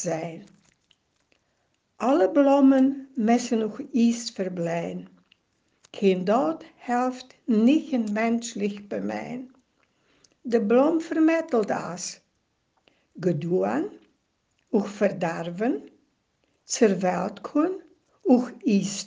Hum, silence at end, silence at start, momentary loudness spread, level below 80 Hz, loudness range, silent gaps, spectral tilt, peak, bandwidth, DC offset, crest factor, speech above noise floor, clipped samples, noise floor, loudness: none; 0 s; 0 s; 13 LU; -72 dBFS; 6 LU; none; -5.5 dB/octave; -6 dBFS; 9.8 kHz; under 0.1%; 20 dB; 49 dB; under 0.1%; -73 dBFS; -24 LUFS